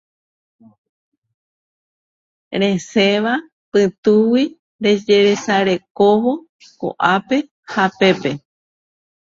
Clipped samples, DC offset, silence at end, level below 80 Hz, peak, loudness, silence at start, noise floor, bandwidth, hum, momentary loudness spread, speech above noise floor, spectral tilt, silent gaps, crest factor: under 0.1%; under 0.1%; 0.95 s; -62 dBFS; 0 dBFS; -17 LUFS; 2.5 s; under -90 dBFS; 7.6 kHz; none; 11 LU; over 74 dB; -5.5 dB/octave; 3.52-3.72 s, 3.98-4.03 s, 4.59-4.79 s, 5.90-5.95 s, 6.49-6.59 s, 7.51-7.63 s; 18 dB